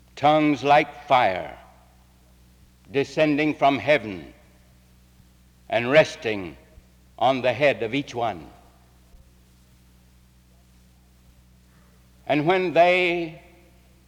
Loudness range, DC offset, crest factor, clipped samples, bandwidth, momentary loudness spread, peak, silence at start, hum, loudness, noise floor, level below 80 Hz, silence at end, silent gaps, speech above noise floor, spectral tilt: 6 LU; under 0.1%; 20 dB; under 0.1%; 14.5 kHz; 14 LU; -4 dBFS; 0.15 s; none; -21 LUFS; -55 dBFS; -56 dBFS; 0.7 s; none; 34 dB; -5.5 dB/octave